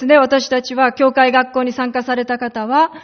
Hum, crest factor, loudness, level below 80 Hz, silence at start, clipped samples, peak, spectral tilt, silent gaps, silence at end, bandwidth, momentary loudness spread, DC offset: none; 14 dB; -15 LUFS; -60 dBFS; 0 s; under 0.1%; 0 dBFS; -1 dB/octave; none; 0 s; 6.6 kHz; 8 LU; under 0.1%